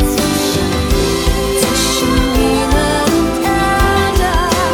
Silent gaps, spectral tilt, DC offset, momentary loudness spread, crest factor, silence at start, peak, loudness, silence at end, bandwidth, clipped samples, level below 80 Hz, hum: none; -4 dB/octave; under 0.1%; 2 LU; 14 dB; 0 s; 0 dBFS; -13 LUFS; 0 s; over 20 kHz; under 0.1%; -20 dBFS; none